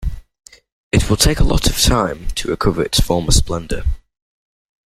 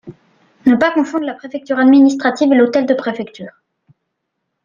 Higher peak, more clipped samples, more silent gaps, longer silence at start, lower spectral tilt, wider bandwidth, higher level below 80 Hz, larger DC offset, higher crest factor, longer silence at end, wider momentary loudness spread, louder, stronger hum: about the same, 0 dBFS vs -2 dBFS; neither; first, 0.72-0.91 s vs none; about the same, 0 s vs 0.05 s; second, -4 dB/octave vs -5.5 dB/octave; first, 16 kHz vs 7.4 kHz; first, -22 dBFS vs -60 dBFS; neither; about the same, 16 dB vs 14 dB; second, 0.9 s vs 1.15 s; second, 10 LU vs 18 LU; second, -17 LUFS vs -14 LUFS; neither